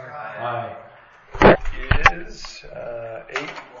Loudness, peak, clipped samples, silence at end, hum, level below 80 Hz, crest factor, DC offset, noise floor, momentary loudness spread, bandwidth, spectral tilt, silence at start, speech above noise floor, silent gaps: -19 LUFS; 0 dBFS; under 0.1%; 0 s; none; -30 dBFS; 22 dB; under 0.1%; -40 dBFS; 21 LU; 7.4 kHz; -6 dB/octave; 0 s; 15 dB; none